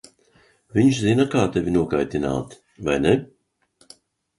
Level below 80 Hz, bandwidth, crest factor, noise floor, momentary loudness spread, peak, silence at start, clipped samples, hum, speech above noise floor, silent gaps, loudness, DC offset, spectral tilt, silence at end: -46 dBFS; 11.5 kHz; 20 dB; -62 dBFS; 9 LU; -4 dBFS; 0.75 s; under 0.1%; none; 42 dB; none; -21 LUFS; under 0.1%; -6.5 dB/octave; 1.15 s